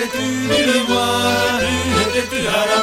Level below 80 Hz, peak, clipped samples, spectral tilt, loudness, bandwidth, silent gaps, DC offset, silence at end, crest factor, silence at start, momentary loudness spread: -40 dBFS; -4 dBFS; under 0.1%; -3.5 dB/octave; -16 LUFS; 16.5 kHz; none; under 0.1%; 0 s; 14 dB; 0 s; 4 LU